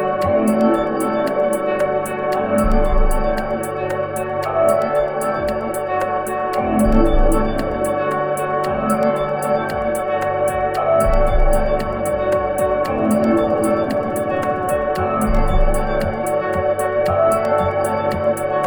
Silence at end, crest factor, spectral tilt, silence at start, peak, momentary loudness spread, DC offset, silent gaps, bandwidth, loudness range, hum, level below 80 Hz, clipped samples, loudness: 0 s; 16 dB; -6 dB/octave; 0 s; -2 dBFS; 5 LU; under 0.1%; none; over 20 kHz; 1 LU; none; -24 dBFS; under 0.1%; -19 LUFS